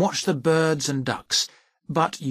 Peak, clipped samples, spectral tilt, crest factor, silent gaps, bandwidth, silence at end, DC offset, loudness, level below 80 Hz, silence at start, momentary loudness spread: -6 dBFS; under 0.1%; -4 dB/octave; 16 dB; none; 15.5 kHz; 0 s; under 0.1%; -23 LUFS; -62 dBFS; 0 s; 7 LU